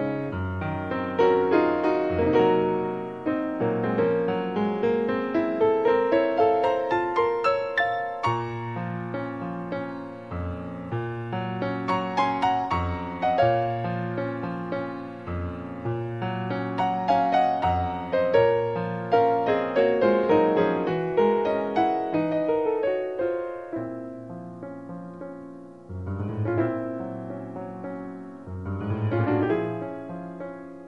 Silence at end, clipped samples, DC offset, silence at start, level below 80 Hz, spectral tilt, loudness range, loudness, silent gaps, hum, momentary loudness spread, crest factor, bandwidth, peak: 0 s; under 0.1%; 0.1%; 0 s; -52 dBFS; -8 dB/octave; 9 LU; -25 LUFS; none; none; 15 LU; 18 dB; 7.4 kHz; -8 dBFS